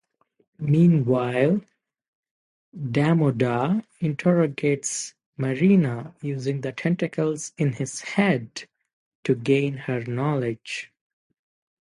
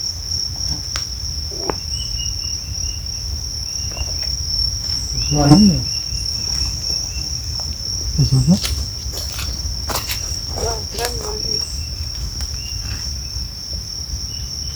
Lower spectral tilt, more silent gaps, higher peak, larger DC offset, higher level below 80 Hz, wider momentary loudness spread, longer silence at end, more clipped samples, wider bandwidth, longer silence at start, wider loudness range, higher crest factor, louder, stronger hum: first, -6.5 dB/octave vs -4 dB/octave; first, 2.08-2.23 s, 2.31-2.72 s, 5.26-5.33 s, 8.93-9.23 s vs none; second, -6 dBFS vs 0 dBFS; neither; second, -64 dBFS vs -30 dBFS; first, 13 LU vs 9 LU; first, 1 s vs 0 s; neither; second, 11.5 kHz vs over 20 kHz; first, 0.6 s vs 0 s; about the same, 4 LU vs 6 LU; about the same, 18 dB vs 20 dB; second, -24 LUFS vs -20 LUFS; neither